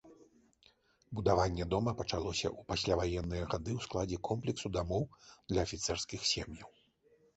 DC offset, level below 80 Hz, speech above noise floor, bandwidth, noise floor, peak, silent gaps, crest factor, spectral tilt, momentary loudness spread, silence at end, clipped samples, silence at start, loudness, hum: under 0.1%; -50 dBFS; 34 dB; 8.2 kHz; -69 dBFS; -16 dBFS; none; 22 dB; -4.5 dB/octave; 6 LU; 0.7 s; under 0.1%; 0.05 s; -36 LUFS; none